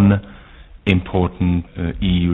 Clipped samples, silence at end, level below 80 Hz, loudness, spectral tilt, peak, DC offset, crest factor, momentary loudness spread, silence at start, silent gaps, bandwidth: under 0.1%; 0 s; -32 dBFS; -19 LUFS; -9.5 dB/octave; 0 dBFS; under 0.1%; 18 dB; 6 LU; 0 s; none; 4 kHz